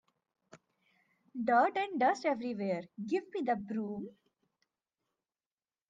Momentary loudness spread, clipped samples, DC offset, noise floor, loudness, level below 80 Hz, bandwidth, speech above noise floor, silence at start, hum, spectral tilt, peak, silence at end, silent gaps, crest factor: 13 LU; under 0.1%; under 0.1%; under -90 dBFS; -33 LUFS; -80 dBFS; 7.8 kHz; over 57 dB; 0.55 s; none; -6 dB/octave; -14 dBFS; 1.8 s; none; 22 dB